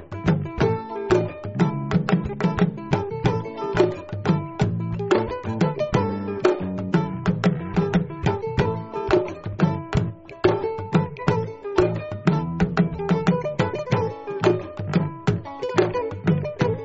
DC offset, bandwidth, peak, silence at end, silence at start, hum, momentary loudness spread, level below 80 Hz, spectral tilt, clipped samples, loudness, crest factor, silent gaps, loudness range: under 0.1%; 8 kHz; -4 dBFS; 0 s; 0 s; none; 4 LU; -44 dBFS; -7 dB/octave; under 0.1%; -24 LUFS; 18 dB; none; 1 LU